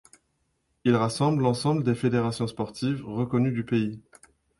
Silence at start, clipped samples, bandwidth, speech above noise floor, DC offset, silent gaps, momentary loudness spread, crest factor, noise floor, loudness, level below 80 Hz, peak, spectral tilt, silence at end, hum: 0.85 s; under 0.1%; 11.5 kHz; 48 dB; under 0.1%; none; 7 LU; 18 dB; -73 dBFS; -26 LUFS; -60 dBFS; -8 dBFS; -7 dB/octave; 0.6 s; none